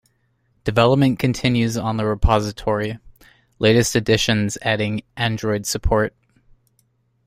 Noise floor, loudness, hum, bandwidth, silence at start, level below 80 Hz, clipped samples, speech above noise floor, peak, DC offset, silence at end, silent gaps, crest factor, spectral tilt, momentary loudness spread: -65 dBFS; -20 LUFS; none; 16 kHz; 0.65 s; -34 dBFS; under 0.1%; 46 dB; -2 dBFS; under 0.1%; 1.2 s; none; 20 dB; -5 dB/octave; 8 LU